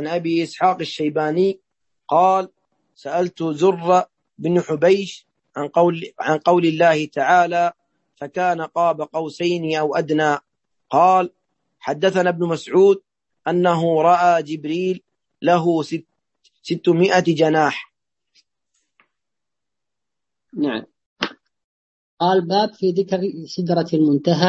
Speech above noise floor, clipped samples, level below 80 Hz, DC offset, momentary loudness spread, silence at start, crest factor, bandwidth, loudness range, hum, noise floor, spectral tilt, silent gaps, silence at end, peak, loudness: 68 dB; under 0.1%; -68 dBFS; under 0.1%; 12 LU; 0 s; 18 dB; 8.4 kHz; 7 LU; none; -85 dBFS; -6 dB/octave; 21.06-21.16 s, 21.64-22.17 s; 0 s; -2 dBFS; -19 LUFS